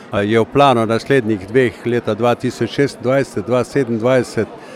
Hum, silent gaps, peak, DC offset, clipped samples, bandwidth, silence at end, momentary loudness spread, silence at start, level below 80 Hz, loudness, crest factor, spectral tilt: none; none; 0 dBFS; under 0.1%; under 0.1%; 14 kHz; 0 s; 7 LU; 0 s; -50 dBFS; -16 LUFS; 16 dB; -6.5 dB/octave